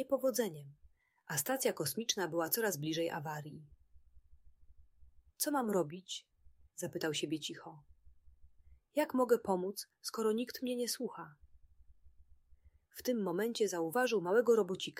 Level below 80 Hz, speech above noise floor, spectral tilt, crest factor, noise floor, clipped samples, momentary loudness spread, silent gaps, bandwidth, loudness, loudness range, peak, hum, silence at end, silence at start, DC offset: -70 dBFS; 29 dB; -3.5 dB/octave; 20 dB; -65 dBFS; under 0.1%; 14 LU; none; 16 kHz; -36 LUFS; 5 LU; -18 dBFS; none; 0 s; 0 s; under 0.1%